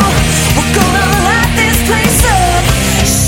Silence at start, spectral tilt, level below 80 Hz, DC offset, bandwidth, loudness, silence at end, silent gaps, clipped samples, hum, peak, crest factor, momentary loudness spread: 0 s; -3.5 dB/octave; -18 dBFS; under 0.1%; 17.5 kHz; -10 LUFS; 0 s; none; under 0.1%; none; 0 dBFS; 10 dB; 2 LU